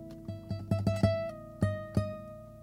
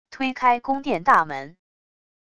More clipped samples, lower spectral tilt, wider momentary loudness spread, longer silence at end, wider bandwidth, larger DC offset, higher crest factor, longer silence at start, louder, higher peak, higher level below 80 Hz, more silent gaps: neither; first, -8 dB/octave vs -5 dB/octave; first, 15 LU vs 11 LU; second, 0 s vs 0.8 s; first, 13.5 kHz vs 11 kHz; neither; about the same, 20 dB vs 20 dB; about the same, 0 s vs 0.1 s; second, -33 LUFS vs -21 LUFS; second, -14 dBFS vs -4 dBFS; first, -50 dBFS vs -60 dBFS; neither